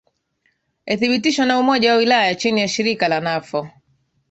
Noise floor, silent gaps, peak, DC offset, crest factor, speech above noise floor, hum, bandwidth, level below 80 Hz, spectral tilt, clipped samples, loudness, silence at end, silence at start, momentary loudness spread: -67 dBFS; none; -2 dBFS; under 0.1%; 16 dB; 49 dB; none; 8.2 kHz; -62 dBFS; -4 dB/octave; under 0.1%; -17 LUFS; 0.6 s; 0.85 s; 10 LU